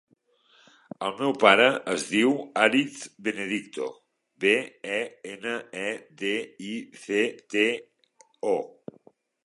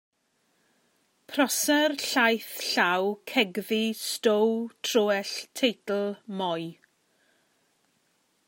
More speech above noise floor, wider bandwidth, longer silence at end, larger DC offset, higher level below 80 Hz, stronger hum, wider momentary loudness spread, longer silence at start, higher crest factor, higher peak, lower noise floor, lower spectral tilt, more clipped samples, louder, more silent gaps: second, 38 dB vs 45 dB; second, 11.5 kHz vs 16.5 kHz; second, 0.8 s vs 1.75 s; neither; first, -78 dBFS vs -84 dBFS; neither; first, 15 LU vs 8 LU; second, 1 s vs 1.3 s; first, 26 dB vs 20 dB; first, -2 dBFS vs -8 dBFS; second, -64 dBFS vs -72 dBFS; about the same, -3.5 dB/octave vs -2.5 dB/octave; neither; about the same, -26 LUFS vs -26 LUFS; neither